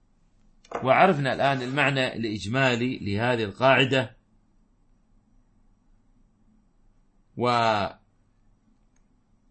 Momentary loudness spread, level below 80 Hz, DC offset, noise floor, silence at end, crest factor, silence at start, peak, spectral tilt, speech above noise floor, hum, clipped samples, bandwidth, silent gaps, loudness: 11 LU; -60 dBFS; under 0.1%; -63 dBFS; 1.55 s; 22 dB; 0.7 s; -4 dBFS; -5.5 dB/octave; 40 dB; none; under 0.1%; 8.8 kHz; none; -24 LUFS